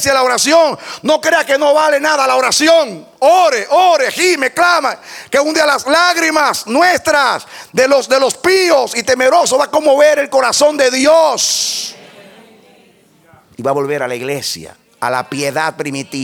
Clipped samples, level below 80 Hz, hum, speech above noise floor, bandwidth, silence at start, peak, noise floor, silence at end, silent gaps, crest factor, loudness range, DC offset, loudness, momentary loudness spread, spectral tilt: under 0.1%; -56 dBFS; none; 36 dB; 18.5 kHz; 0 s; 0 dBFS; -48 dBFS; 0 s; none; 12 dB; 8 LU; under 0.1%; -12 LUFS; 10 LU; -2 dB/octave